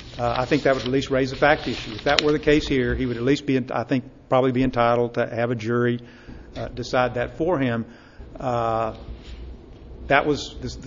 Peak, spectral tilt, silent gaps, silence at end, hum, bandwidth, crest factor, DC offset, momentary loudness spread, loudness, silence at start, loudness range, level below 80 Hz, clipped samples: 0 dBFS; -6 dB/octave; none; 0 s; none; 7.6 kHz; 22 dB; under 0.1%; 18 LU; -22 LUFS; 0 s; 5 LU; -40 dBFS; under 0.1%